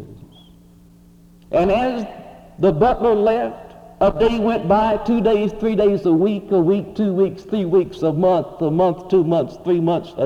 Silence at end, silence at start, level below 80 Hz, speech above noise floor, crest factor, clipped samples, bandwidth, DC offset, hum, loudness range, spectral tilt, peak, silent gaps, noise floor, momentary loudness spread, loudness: 0 s; 0 s; -42 dBFS; 30 dB; 16 dB; under 0.1%; 7.8 kHz; under 0.1%; none; 2 LU; -8.5 dB/octave; -4 dBFS; none; -47 dBFS; 5 LU; -18 LUFS